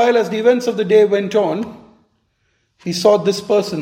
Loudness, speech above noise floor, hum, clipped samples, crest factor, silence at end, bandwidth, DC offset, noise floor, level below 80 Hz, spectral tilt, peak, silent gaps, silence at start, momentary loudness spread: -16 LUFS; 50 dB; none; under 0.1%; 16 dB; 0 s; 15.5 kHz; under 0.1%; -65 dBFS; -64 dBFS; -5 dB/octave; 0 dBFS; none; 0 s; 12 LU